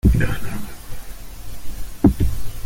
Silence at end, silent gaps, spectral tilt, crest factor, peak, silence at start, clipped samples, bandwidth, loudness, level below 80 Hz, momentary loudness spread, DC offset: 0 s; none; -7 dB/octave; 18 dB; -2 dBFS; 0.05 s; under 0.1%; 17 kHz; -21 LUFS; -26 dBFS; 20 LU; under 0.1%